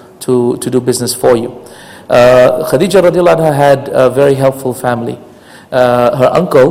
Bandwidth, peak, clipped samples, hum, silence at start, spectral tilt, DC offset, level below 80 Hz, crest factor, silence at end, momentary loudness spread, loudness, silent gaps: 16.5 kHz; 0 dBFS; 0.9%; none; 0.2 s; -5.5 dB/octave; under 0.1%; -44 dBFS; 10 dB; 0 s; 8 LU; -10 LUFS; none